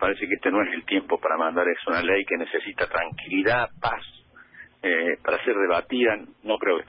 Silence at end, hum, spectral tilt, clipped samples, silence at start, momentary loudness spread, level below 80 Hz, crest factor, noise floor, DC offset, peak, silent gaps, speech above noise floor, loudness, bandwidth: 0.05 s; none; -9 dB/octave; under 0.1%; 0 s; 6 LU; -56 dBFS; 14 dB; -49 dBFS; under 0.1%; -10 dBFS; none; 24 dB; -24 LUFS; 5.6 kHz